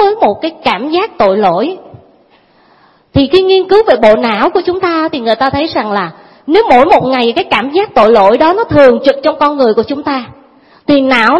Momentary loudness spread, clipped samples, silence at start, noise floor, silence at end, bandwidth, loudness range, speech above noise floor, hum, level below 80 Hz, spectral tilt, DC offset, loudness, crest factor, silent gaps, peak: 9 LU; 0.8%; 0 s; -47 dBFS; 0 s; 11 kHz; 4 LU; 38 dB; none; -40 dBFS; -6.5 dB/octave; under 0.1%; -10 LUFS; 10 dB; none; 0 dBFS